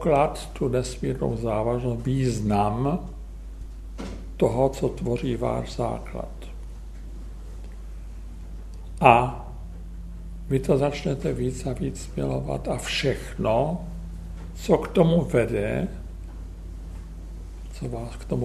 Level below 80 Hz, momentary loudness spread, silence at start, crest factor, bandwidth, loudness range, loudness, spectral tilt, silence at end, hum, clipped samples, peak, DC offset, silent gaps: -36 dBFS; 19 LU; 0 s; 26 dB; 13.5 kHz; 6 LU; -25 LUFS; -6.5 dB/octave; 0 s; none; under 0.1%; 0 dBFS; under 0.1%; none